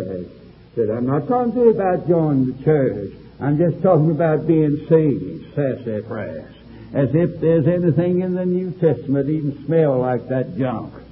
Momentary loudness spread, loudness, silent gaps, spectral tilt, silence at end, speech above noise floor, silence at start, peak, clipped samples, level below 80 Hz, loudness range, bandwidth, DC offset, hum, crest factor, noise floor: 12 LU; -19 LUFS; none; -14 dB/octave; 0.05 s; 24 dB; 0 s; -2 dBFS; under 0.1%; -48 dBFS; 3 LU; 5.2 kHz; under 0.1%; none; 16 dB; -43 dBFS